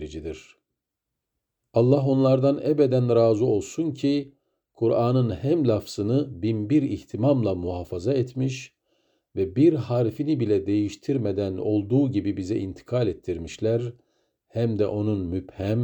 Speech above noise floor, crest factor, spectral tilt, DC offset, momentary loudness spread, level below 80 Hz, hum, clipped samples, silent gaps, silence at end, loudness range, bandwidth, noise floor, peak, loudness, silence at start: 61 dB; 18 dB; -8 dB/octave; under 0.1%; 10 LU; -56 dBFS; none; under 0.1%; none; 0 s; 4 LU; over 20 kHz; -84 dBFS; -6 dBFS; -24 LUFS; 0 s